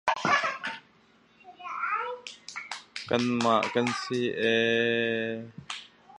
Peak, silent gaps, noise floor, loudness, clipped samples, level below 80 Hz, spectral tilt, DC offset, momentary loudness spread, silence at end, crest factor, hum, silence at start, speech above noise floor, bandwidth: -8 dBFS; none; -61 dBFS; -28 LUFS; under 0.1%; -70 dBFS; -4 dB/octave; under 0.1%; 15 LU; 0 s; 20 dB; none; 0.05 s; 34 dB; 11 kHz